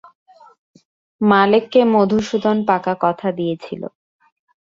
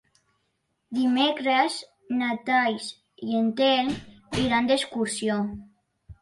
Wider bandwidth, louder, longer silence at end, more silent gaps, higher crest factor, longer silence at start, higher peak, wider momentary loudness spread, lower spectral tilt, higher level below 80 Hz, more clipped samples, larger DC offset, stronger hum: second, 7.6 kHz vs 11.5 kHz; first, -17 LUFS vs -25 LUFS; first, 0.85 s vs 0.1 s; neither; about the same, 16 dB vs 18 dB; first, 1.2 s vs 0.9 s; first, -2 dBFS vs -8 dBFS; about the same, 14 LU vs 12 LU; first, -6.5 dB/octave vs -4 dB/octave; about the same, -58 dBFS vs -56 dBFS; neither; neither; neither